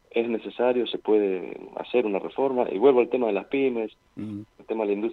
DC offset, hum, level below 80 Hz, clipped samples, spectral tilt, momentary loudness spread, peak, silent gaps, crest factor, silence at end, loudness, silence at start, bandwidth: under 0.1%; none; -68 dBFS; under 0.1%; -8 dB/octave; 16 LU; -8 dBFS; none; 18 dB; 0 s; -25 LUFS; 0.15 s; 4.4 kHz